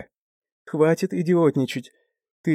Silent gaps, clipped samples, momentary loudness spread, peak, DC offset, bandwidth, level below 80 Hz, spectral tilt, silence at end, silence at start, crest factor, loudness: 0.16-0.42 s, 0.52-0.65 s, 2.31-2.44 s; under 0.1%; 12 LU; -6 dBFS; under 0.1%; 15 kHz; -72 dBFS; -7 dB/octave; 0 s; 0 s; 18 dB; -22 LUFS